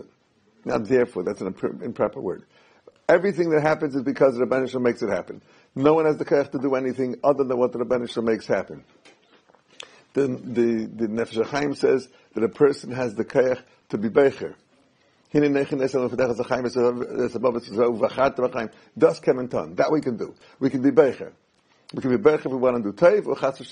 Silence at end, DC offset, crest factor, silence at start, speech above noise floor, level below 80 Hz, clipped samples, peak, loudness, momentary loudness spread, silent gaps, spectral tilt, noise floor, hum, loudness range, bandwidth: 0 s; under 0.1%; 20 dB; 0.65 s; 39 dB; -60 dBFS; under 0.1%; -4 dBFS; -23 LUFS; 12 LU; none; -7 dB/octave; -62 dBFS; none; 4 LU; 10 kHz